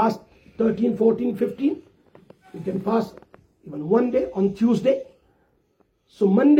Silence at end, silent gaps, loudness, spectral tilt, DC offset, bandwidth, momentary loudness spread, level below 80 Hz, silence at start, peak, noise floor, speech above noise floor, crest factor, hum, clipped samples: 0 s; none; -22 LUFS; -8.5 dB/octave; under 0.1%; 8.4 kHz; 15 LU; -60 dBFS; 0 s; -6 dBFS; -65 dBFS; 45 dB; 16 dB; none; under 0.1%